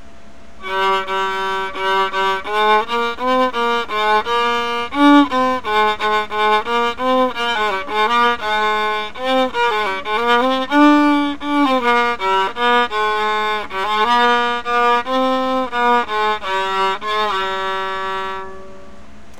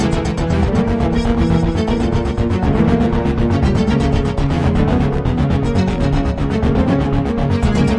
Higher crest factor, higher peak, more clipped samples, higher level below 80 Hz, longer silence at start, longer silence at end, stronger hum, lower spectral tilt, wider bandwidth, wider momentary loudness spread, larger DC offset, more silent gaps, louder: about the same, 16 dB vs 12 dB; about the same, -2 dBFS vs -2 dBFS; neither; second, -48 dBFS vs -22 dBFS; first, 0.6 s vs 0 s; first, 0.35 s vs 0 s; neither; second, -3.5 dB/octave vs -8 dB/octave; first, 17.5 kHz vs 11 kHz; first, 7 LU vs 3 LU; first, 3% vs under 0.1%; neither; about the same, -17 LUFS vs -16 LUFS